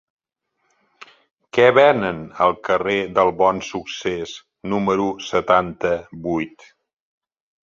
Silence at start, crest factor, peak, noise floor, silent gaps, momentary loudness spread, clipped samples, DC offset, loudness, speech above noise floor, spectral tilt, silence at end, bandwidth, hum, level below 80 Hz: 1.55 s; 20 dB; -2 dBFS; -73 dBFS; none; 12 LU; under 0.1%; under 0.1%; -19 LUFS; 54 dB; -5.5 dB/octave; 1.15 s; 7.6 kHz; none; -54 dBFS